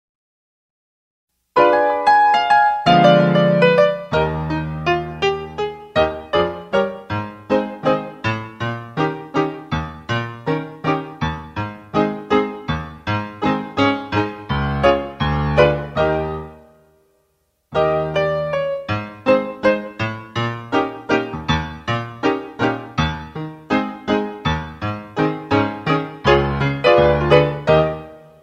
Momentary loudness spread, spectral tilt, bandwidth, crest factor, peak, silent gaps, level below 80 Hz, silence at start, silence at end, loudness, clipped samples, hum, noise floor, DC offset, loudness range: 12 LU; -7 dB/octave; 8.8 kHz; 18 dB; 0 dBFS; none; -38 dBFS; 1.55 s; 0.25 s; -19 LUFS; under 0.1%; none; -66 dBFS; under 0.1%; 8 LU